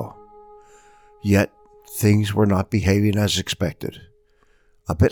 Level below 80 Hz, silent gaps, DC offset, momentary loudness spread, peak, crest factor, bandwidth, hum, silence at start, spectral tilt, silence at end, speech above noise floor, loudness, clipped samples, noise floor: -44 dBFS; none; under 0.1%; 15 LU; -4 dBFS; 18 dB; 19 kHz; none; 0 s; -6 dB/octave; 0 s; 39 dB; -20 LUFS; under 0.1%; -58 dBFS